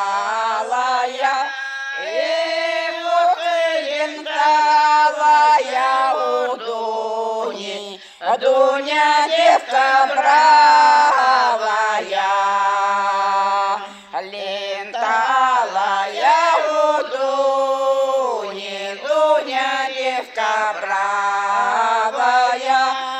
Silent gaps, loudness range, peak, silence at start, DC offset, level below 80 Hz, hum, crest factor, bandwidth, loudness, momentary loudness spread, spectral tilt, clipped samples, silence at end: none; 6 LU; -2 dBFS; 0 s; under 0.1%; -72 dBFS; none; 14 dB; 10.5 kHz; -17 LUFS; 11 LU; -1 dB/octave; under 0.1%; 0 s